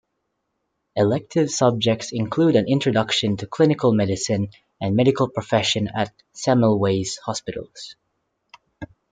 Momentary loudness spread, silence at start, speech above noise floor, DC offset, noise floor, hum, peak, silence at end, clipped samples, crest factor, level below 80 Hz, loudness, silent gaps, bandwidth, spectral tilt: 14 LU; 0.95 s; 55 dB; under 0.1%; -75 dBFS; none; -4 dBFS; 0.25 s; under 0.1%; 18 dB; -58 dBFS; -21 LUFS; none; 9.6 kHz; -5.5 dB/octave